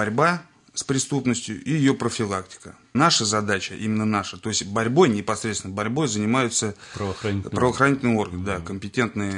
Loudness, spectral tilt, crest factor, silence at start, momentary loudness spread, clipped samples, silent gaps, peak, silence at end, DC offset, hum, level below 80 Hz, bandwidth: -23 LUFS; -4.5 dB/octave; 20 dB; 0 s; 11 LU; under 0.1%; none; -4 dBFS; 0 s; under 0.1%; none; -58 dBFS; 11 kHz